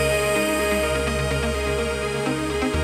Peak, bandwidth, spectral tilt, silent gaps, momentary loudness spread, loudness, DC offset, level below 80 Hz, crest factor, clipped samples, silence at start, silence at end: -8 dBFS; 16 kHz; -4.5 dB/octave; none; 4 LU; -23 LUFS; under 0.1%; -32 dBFS; 14 dB; under 0.1%; 0 s; 0 s